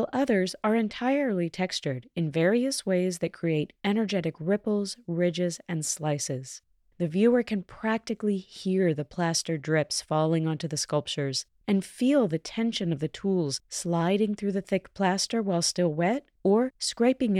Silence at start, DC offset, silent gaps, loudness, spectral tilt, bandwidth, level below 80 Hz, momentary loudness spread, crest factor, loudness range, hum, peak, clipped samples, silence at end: 0 s; under 0.1%; none; -27 LUFS; -5 dB/octave; 14.5 kHz; -64 dBFS; 6 LU; 16 dB; 2 LU; none; -12 dBFS; under 0.1%; 0 s